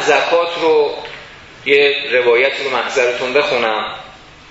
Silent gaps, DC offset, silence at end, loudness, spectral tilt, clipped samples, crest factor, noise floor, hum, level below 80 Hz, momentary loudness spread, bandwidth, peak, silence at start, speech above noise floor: none; under 0.1%; 0.35 s; -14 LUFS; -2.5 dB/octave; under 0.1%; 16 dB; -38 dBFS; none; -54 dBFS; 14 LU; 8 kHz; 0 dBFS; 0 s; 23 dB